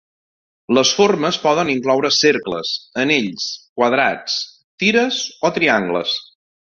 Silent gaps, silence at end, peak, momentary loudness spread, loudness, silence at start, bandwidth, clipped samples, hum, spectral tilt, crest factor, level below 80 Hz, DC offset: 3.69-3.76 s, 4.64-4.78 s; 0.45 s; -2 dBFS; 9 LU; -17 LUFS; 0.7 s; 7.6 kHz; under 0.1%; none; -3 dB/octave; 16 dB; -60 dBFS; under 0.1%